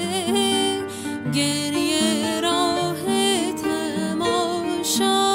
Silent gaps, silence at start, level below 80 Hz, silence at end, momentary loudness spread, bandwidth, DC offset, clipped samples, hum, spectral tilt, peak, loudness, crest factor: none; 0 s; -60 dBFS; 0 s; 5 LU; 16 kHz; under 0.1%; under 0.1%; none; -3 dB/octave; -6 dBFS; -21 LUFS; 14 dB